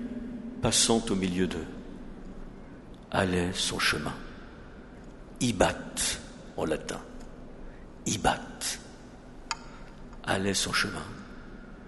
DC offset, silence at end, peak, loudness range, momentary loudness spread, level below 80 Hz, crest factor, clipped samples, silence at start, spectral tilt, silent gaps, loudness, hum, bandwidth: under 0.1%; 0 s; -6 dBFS; 5 LU; 22 LU; -46 dBFS; 26 dB; under 0.1%; 0 s; -3 dB/octave; none; -29 LUFS; none; 11.5 kHz